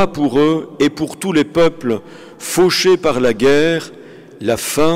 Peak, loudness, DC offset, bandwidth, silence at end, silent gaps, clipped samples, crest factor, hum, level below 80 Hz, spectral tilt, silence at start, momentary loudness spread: -6 dBFS; -15 LUFS; under 0.1%; 16 kHz; 0 s; none; under 0.1%; 10 dB; none; -44 dBFS; -4.5 dB/octave; 0 s; 9 LU